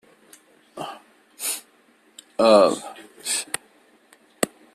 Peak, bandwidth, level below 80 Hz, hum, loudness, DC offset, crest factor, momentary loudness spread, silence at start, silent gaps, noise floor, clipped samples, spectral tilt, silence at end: -2 dBFS; 15 kHz; -68 dBFS; none; -22 LUFS; under 0.1%; 24 dB; 21 LU; 0.75 s; none; -58 dBFS; under 0.1%; -2.5 dB/octave; 0.25 s